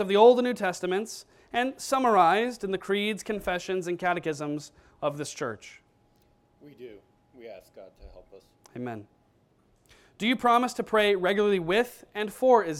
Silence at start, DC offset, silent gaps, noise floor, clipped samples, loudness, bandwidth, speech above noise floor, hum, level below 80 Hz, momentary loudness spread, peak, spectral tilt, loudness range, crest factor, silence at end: 0 s; under 0.1%; none; -65 dBFS; under 0.1%; -26 LUFS; 16 kHz; 39 dB; none; -60 dBFS; 22 LU; -6 dBFS; -4.5 dB/octave; 19 LU; 22 dB; 0 s